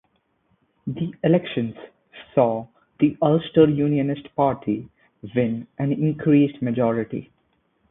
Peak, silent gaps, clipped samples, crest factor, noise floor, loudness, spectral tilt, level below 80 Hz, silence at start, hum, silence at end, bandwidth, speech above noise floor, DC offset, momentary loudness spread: -2 dBFS; none; under 0.1%; 20 dB; -67 dBFS; -22 LUFS; -12.5 dB/octave; -58 dBFS; 0.85 s; none; 0.7 s; 3.9 kHz; 46 dB; under 0.1%; 13 LU